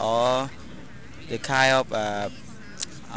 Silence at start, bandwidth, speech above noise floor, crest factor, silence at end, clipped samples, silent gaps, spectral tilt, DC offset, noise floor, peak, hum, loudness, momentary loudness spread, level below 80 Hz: 0 s; 8 kHz; 19 dB; 24 dB; 0 s; under 0.1%; none; -3.5 dB/octave; 1%; -43 dBFS; -4 dBFS; none; -25 LUFS; 23 LU; -54 dBFS